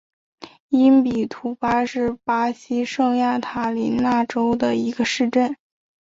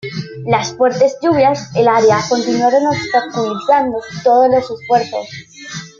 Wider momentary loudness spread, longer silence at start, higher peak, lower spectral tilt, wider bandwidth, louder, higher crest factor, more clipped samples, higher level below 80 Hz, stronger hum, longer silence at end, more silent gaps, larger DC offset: second, 8 LU vs 13 LU; first, 0.4 s vs 0.05 s; second, -6 dBFS vs -2 dBFS; about the same, -5 dB/octave vs -5 dB/octave; about the same, 7.8 kHz vs 7.6 kHz; second, -20 LUFS vs -14 LUFS; about the same, 16 dB vs 12 dB; neither; about the same, -54 dBFS vs -54 dBFS; neither; first, 0.55 s vs 0.1 s; first, 0.60-0.69 s vs none; neither